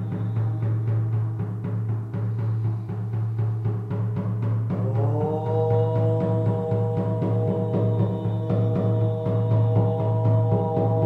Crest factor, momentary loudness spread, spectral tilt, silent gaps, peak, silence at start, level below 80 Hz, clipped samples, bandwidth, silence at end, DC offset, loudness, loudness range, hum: 14 dB; 6 LU; -11 dB/octave; none; -10 dBFS; 0 s; -52 dBFS; under 0.1%; 3.9 kHz; 0 s; under 0.1%; -24 LUFS; 4 LU; none